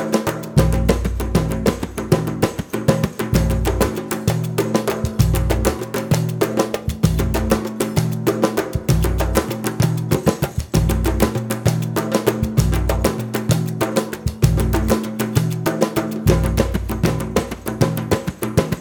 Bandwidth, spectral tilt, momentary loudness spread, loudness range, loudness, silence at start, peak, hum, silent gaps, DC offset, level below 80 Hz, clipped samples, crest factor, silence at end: over 20 kHz; -6 dB/octave; 4 LU; 1 LU; -20 LUFS; 0 s; 0 dBFS; none; none; under 0.1%; -26 dBFS; under 0.1%; 18 dB; 0 s